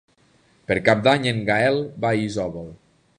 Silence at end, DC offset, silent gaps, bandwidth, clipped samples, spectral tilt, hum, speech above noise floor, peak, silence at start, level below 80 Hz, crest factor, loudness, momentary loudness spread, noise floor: 0.45 s; under 0.1%; none; 10.5 kHz; under 0.1%; -6 dB/octave; none; 38 dB; -2 dBFS; 0.7 s; -52 dBFS; 20 dB; -21 LUFS; 17 LU; -59 dBFS